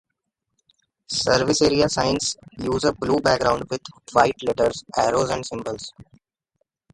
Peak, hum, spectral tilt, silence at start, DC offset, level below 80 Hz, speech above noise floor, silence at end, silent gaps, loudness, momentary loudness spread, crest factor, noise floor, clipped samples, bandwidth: -2 dBFS; none; -4 dB/octave; 1.1 s; under 0.1%; -48 dBFS; 58 dB; 0.9 s; none; -22 LUFS; 12 LU; 20 dB; -79 dBFS; under 0.1%; 11.5 kHz